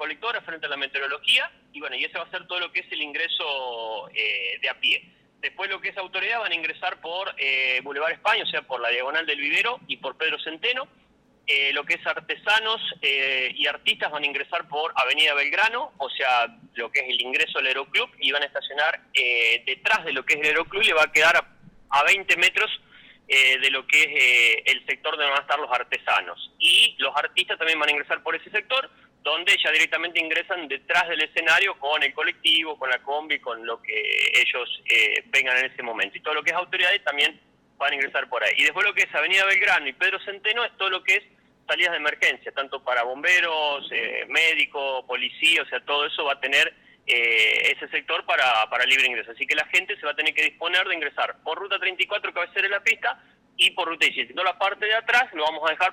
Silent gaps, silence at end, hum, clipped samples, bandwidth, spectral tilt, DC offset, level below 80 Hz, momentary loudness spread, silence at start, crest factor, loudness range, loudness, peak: none; 0 s; none; under 0.1%; 19 kHz; 0 dB/octave; under 0.1%; -68 dBFS; 10 LU; 0 s; 14 dB; 6 LU; -22 LUFS; -10 dBFS